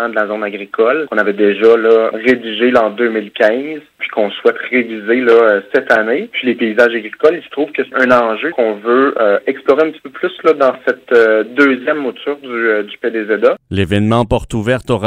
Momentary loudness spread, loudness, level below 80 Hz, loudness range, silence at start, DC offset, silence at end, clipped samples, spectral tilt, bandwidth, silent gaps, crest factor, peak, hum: 9 LU; -13 LUFS; -44 dBFS; 2 LU; 0 s; under 0.1%; 0 s; 0.1%; -6.5 dB/octave; 10 kHz; none; 14 dB; 0 dBFS; none